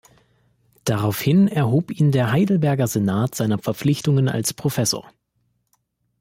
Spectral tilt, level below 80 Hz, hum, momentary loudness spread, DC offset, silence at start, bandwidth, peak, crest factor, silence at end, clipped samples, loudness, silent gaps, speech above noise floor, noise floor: -6 dB/octave; -56 dBFS; none; 5 LU; under 0.1%; 0.85 s; 16.5 kHz; -8 dBFS; 12 dB; 1.2 s; under 0.1%; -20 LUFS; none; 50 dB; -70 dBFS